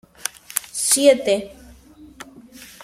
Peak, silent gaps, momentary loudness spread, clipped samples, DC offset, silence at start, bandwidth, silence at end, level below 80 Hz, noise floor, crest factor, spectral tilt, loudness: 0 dBFS; none; 26 LU; under 0.1%; under 0.1%; 0.55 s; 16.5 kHz; 0.2 s; -56 dBFS; -46 dBFS; 22 dB; -1.5 dB/octave; -19 LUFS